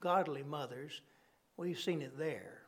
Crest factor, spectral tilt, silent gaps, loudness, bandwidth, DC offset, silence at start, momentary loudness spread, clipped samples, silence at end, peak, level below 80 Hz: 20 dB; -5.5 dB/octave; none; -40 LUFS; 18 kHz; under 0.1%; 0 s; 14 LU; under 0.1%; 0.05 s; -20 dBFS; -88 dBFS